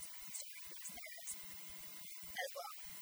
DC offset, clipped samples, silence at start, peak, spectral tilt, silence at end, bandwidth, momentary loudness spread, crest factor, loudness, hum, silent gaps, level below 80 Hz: under 0.1%; under 0.1%; 0 s; -28 dBFS; 0 dB/octave; 0 s; over 20 kHz; 4 LU; 20 dB; -47 LUFS; none; none; -76 dBFS